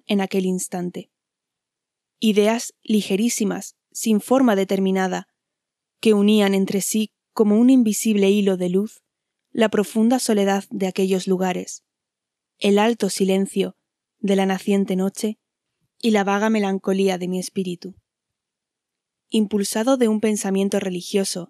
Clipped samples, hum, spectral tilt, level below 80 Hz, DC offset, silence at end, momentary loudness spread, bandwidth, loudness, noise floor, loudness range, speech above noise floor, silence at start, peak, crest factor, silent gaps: under 0.1%; none; -5 dB/octave; -76 dBFS; under 0.1%; 0.05 s; 11 LU; 13.5 kHz; -20 LUFS; -84 dBFS; 5 LU; 65 dB; 0.1 s; -4 dBFS; 16 dB; none